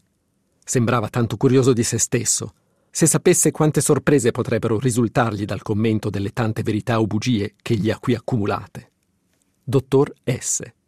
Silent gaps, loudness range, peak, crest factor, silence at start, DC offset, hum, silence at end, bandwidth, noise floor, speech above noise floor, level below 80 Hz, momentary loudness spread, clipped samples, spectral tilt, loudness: none; 5 LU; -4 dBFS; 16 dB; 0.65 s; 0.2%; none; 0.15 s; 15.5 kHz; -67 dBFS; 48 dB; -54 dBFS; 8 LU; under 0.1%; -5 dB/octave; -20 LUFS